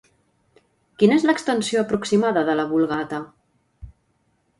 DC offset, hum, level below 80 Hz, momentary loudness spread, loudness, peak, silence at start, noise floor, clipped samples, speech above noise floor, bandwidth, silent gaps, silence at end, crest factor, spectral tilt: under 0.1%; none; -54 dBFS; 11 LU; -21 LUFS; -4 dBFS; 1 s; -67 dBFS; under 0.1%; 47 dB; 11.5 kHz; none; 0.7 s; 20 dB; -5.5 dB/octave